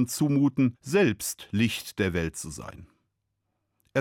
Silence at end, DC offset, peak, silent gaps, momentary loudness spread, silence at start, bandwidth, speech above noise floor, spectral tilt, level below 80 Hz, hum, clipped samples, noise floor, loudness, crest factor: 0 s; under 0.1%; -12 dBFS; none; 13 LU; 0 s; 17.5 kHz; 53 dB; -5.5 dB/octave; -56 dBFS; none; under 0.1%; -79 dBFS; -27 LUFS; 16 dB